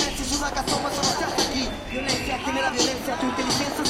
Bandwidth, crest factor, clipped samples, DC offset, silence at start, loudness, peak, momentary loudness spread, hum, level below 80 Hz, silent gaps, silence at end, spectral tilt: 16.5 kHz; 18 dB; under 0.1%; under 0.1%; 0 s; -24 LUFS; -8 dBFS; 4 LU; none; -40 dBFS; none; 0 s; -2.5 dB/octave